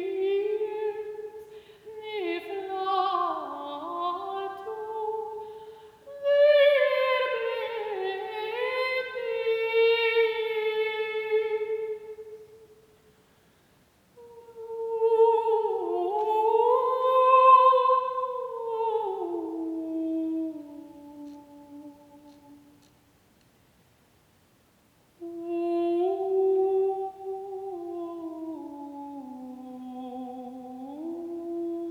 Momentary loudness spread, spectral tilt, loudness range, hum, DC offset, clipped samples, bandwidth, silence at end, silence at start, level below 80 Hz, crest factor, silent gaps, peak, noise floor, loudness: 20 LU; -4.5 dB/octave; 16 LU; none; under 0.1%; under 0.1%; 14.5 kHz; 0 s; 0 s; -74 dBFS; 20 dB; none; -8 dBFS; -63 dBFS; -26 LUFS